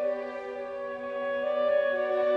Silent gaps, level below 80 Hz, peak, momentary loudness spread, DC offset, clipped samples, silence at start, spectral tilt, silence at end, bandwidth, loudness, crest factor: none; -70 dBFS; -16 dBFS; 10 LU; under 0.1%; under 0.1%; 0 s; -5 dB/octave; 0 s; 5.8 kHz; -30 LUFS; 12 dB